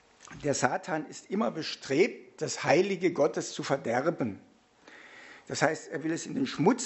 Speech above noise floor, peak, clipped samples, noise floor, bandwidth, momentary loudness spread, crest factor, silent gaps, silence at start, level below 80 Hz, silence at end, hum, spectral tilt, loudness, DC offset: 27 dB; -6 dBFS; under 0.1%; -56 dBFS; 8.2 kHz; 12 LU; 24 dB; none; 0.3 s; -70 dBFS; 0 s; none; -4.5 dB/octave; -30 LUFS; under 0.1%